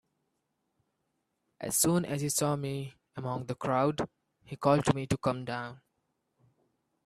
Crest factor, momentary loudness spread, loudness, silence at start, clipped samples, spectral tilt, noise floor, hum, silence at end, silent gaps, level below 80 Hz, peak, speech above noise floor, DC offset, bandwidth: 24 dB; 14 LU; -31 LUFS; 1.6 s; under 0.1%; -5 dB/octave; -80 dBFS; none; 1.3 s; none; -62 dBFS; -10 dBFS; 50 dB; under 0.1%; 15 kHz